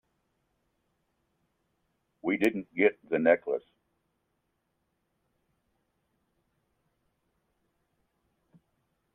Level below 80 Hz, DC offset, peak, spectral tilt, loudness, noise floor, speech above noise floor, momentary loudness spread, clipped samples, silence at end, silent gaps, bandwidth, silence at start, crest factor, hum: -76 dBFS; under 0.1%; -8 dBFS; -6.5 dB/octave; -28 LUFS; -79 dBFS; 52 dB; 10 LU; under 0.1%; 5.55 s; none; 14 kHz; 2.25 s; 26 dB; none